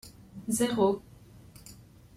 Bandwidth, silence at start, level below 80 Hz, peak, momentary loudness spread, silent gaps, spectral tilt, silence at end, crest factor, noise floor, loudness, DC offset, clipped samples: 16 kHz; 0.05 s; -60 dBFS; -12 dBFS; 24 LU; none; -4.5 dB/octave; 0.45 s; 20 dB; -52 dBFS; -29 LUFS; under 0.1%; under 0.1%